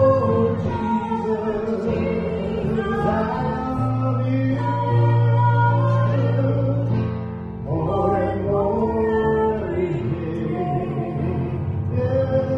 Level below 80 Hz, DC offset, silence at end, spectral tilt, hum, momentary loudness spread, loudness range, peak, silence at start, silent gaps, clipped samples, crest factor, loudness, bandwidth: -40 dBFS; under 0.1%; 0 s; -10 dB/octave; none; 7 LU; 3 LU; -6 dBFS; 0 s; none; under 0.1%; 14 dB; -21 LUFS; 5.6 kHz